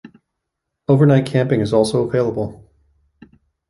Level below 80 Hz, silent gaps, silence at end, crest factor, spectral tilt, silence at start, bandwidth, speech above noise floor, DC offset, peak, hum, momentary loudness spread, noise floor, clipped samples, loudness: -52 dBFS; none; 1.15 s; 16 dB; -7.5 dB/octave; 0.05 s; 11.5 kHz; 63 dB; under 0.1%; -2 dBFS; none; 13 LU; -78 dBFS; under 0.1%; -17 LUFS